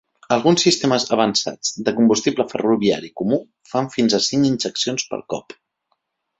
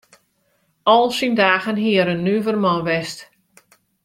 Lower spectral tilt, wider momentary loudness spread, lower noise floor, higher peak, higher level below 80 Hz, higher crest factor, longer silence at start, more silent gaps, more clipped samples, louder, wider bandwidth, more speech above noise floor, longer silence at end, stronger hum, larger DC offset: second, -4 dB/octave vs -5.5 dB/octave; about the same, 9 LU vs 8 LU; first, -72 dBFS vs -65 dBFS; about the same, -2 dBFS vs 0 dBFS; about the same, -58 dBFS vs -60 dBFS; about the same, 18 dB vs 20 dB; second, 0.3 s vs 0.85 s; neither; neither; about the same, -19 LUFS vs -18 LUFS; second, 8.2 kHz vs 15 kHz; first, 53 dB vs 48 dB; first, 1 s vs 0.8 s; neither; neither